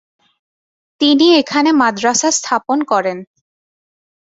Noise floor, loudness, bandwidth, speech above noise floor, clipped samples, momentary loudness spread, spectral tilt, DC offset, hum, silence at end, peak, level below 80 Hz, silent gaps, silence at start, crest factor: under -90 dBFS; -13 LUFS; 8 kHz; over 77 dB; under 0.1%; 7 LU; -2 dB/octave; under 0.1%; none; 1.1 s; 0 dBFS; -62 dBFS; none; 1 s; 16 dB